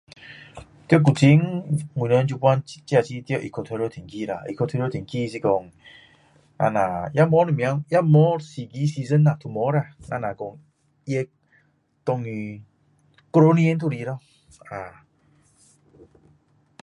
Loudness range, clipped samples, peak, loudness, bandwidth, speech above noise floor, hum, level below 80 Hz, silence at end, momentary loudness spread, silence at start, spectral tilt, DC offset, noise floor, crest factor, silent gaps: 8 LU; under 0.1%; -2 dBFS; -22 LUFS; 11 kHz; 42 dB; none; -58 dBFS; 1.95 s; 19 LU; 0.25 s; -8 dB/octave; under 0.1%; -64 dBFS; 22 dB; none